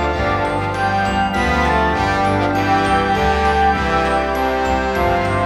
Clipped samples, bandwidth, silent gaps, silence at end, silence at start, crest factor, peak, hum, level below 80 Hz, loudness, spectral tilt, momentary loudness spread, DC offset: under 0.1%; 15.5 kHz; none; 0 s; 0 s; 12 dB; -4 dBFS; none; -28 dBFS; -17 LUFS; -6 dB/octave; 3 LU; under 0.1%